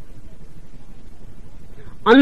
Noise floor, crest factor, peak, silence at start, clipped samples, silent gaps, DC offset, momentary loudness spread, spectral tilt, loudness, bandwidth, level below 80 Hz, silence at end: -36 dBFS; 18 dB; -4 dBFS; 1.1 s; under 0.1%; none; 4%; 24 LU; -6 dB/octave; -17 LUFS; 7.8 kHz; -44 dBFS; 0 s